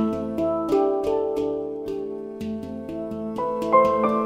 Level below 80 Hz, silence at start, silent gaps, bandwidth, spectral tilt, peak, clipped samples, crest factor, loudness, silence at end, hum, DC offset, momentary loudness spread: -54 dBFS; 0 s; none; 15.5 kHz; -7.5 dB/octave; -6 dBFS; under 0.1%; 18 dB; -24 LUFS; 0 s; none; under 0.1%; 13 LU